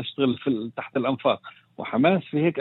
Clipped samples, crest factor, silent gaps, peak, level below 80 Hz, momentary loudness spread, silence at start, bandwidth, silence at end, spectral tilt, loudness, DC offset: under 0.1%; 18 dB; none; -6 dBFS; -68 dBFS; 9 LU; 0 s; 4.2 kHz; 0 s; -10 dB/octave; -25 LUFS; under 0.1%